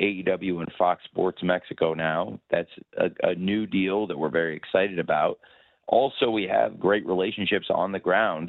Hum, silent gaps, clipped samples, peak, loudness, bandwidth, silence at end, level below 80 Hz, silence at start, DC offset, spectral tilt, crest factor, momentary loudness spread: none; none; under 0.1%; -6 dBFS; -25 LUFS; 4.3 kHz; 0 s; -64 dBFS; 0 s; under 0.1%; -8.5 dB/octave; 20 dB; 5 LU